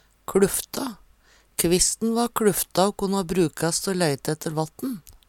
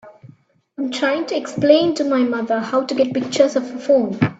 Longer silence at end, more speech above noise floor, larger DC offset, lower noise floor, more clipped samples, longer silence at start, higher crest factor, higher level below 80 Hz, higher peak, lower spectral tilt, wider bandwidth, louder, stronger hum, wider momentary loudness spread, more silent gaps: about the same, 0.15 s vs 0.05 s; about the same, 34 dB vs 32 dB; neither; first, -57 dBFS vs -50 dBFS; neither; first, 0.3 s vs 0.05 s; about the same, 18 dB vs 18 dB; first, -48 dBFS vs -62 dBFS; second, -6 dBFS vs 0 dBFS; second, -4 dB/octave vs -5.5 dB/octave; first, 18 kHz vs 8 kHz; second, -24 LUFS vs -18 LUFS; neither; about the same, 11 LU vs 9 LU; neither